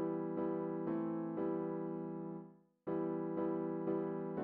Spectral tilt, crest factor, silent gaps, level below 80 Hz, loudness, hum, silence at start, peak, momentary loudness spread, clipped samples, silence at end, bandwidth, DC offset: -9.5 dB/octave; 12 dB; none; -80 dBFS; -40 LUFS; none; 0 s; -28 dBFS; 7 LU; under 0.1%; 0 s; 3.2 kHz; under 0.1%